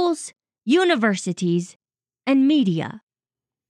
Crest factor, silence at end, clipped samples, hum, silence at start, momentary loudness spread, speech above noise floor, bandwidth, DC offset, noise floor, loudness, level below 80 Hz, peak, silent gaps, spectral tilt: 16 dB; 0.7 s; under 0.1%; none; 0 s; 16 LU; over 70 dB; 11.5 kHz; under 0.1%; under -90 dBFS; -21 LUFS; -78 dBFS; -6 dBFS; 1.76-1.80 s; -5.5 dB/octave